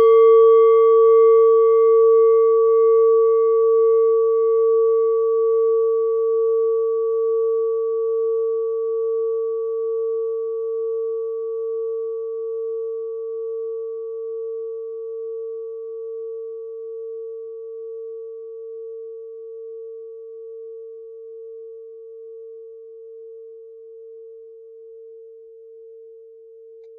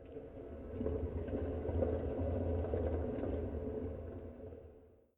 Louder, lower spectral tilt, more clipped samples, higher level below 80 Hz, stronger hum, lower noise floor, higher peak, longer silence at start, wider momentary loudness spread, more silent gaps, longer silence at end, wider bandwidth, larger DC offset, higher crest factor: first, -18 LUFS vs -40 LUFS; second, 4 dB/octave vs -11.5 dB/octave; neither; second, -84 dBFS vs -46 dBFS; neither; second, -44 dBFS vs -61 dBFS; first, -6 dBFS vs -22 dBFS; about the same, 0 s vs 0 s; first, 24 LU vs 13 LU; neither; second, 0 s vs 0.25 s; second, 3.3 kHz vs 3.7 kHz; neither; about the same, 14 dB vs 18 dB